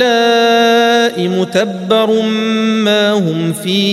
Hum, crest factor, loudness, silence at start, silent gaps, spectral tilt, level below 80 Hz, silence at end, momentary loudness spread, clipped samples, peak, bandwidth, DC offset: none; 12 dB; -12 LUFS; 0 s; none; -4.5 dB/octave; -62 dBFS; 0 s; 6 LU; under 0.1%; 0 dBFS; 15.5 kHz; under 0.1%